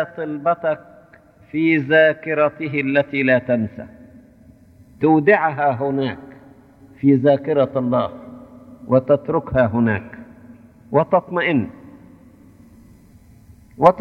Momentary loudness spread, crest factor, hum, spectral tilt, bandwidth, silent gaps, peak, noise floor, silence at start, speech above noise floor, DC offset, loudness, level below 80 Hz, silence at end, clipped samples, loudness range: 14 LU; 20 dB; none; -9 dB/octave; 5.8 kHz; none; 0 dBFS; -49 dBFS; 0 s; 31 dB; under 0.1%; -18 LUFS; -52 dBFS; 0 s; under 0.1%; 4 LU